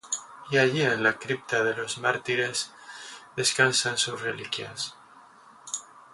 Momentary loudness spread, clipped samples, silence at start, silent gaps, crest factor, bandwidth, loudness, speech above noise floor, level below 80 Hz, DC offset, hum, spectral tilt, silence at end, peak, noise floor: 14 LU; under 0.1%; 0.05 s; none; 24 dB; 11.5 kHz; -26 LUFS; 26 dB; -70 dBFS; under 0.1%; none; -2.5 dB/octave; 0.1 s; -4 dBFS; -53 dBFS